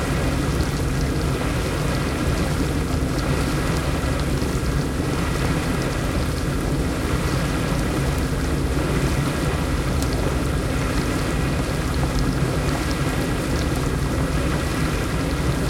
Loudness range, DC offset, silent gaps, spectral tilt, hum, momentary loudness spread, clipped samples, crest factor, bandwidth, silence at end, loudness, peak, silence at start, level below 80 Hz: 0 LU; under 0.1%; none; -5.5 dB/octave; none; 1 LU; under 0.1%; 14 dB; 17 kHz; 0 s; -23 LUFS; -8 dBFS; 0 s; -28 dBFS